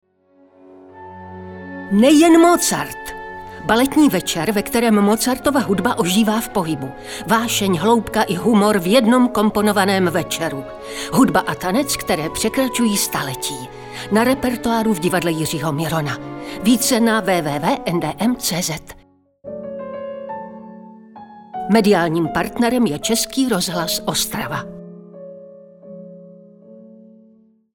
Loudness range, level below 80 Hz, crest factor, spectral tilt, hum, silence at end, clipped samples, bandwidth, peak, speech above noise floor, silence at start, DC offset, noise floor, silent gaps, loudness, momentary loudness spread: 8 LU; -48 dBFS; 18 dB; -4 dB/octave; none; 0.95 s; under 0.1%; 19.5 kHz; -2 dBFS; 37 dB; 0.75 s; under 0.1%; -54 dBFS; none; -17 LUFS; 18 LU